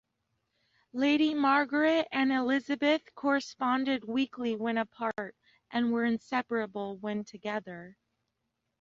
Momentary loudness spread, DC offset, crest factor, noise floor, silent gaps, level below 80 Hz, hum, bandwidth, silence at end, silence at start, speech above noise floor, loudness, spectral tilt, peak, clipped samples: 11 LU; under 0.1%; 18 dB; -82 dBFS; none; -74 dBFS; none; 7.6 kHz; 0.9 s; 0.95 s; 53 dB; -30 LUFS; -5 dB/octave; -14 dBFS; under 0.1%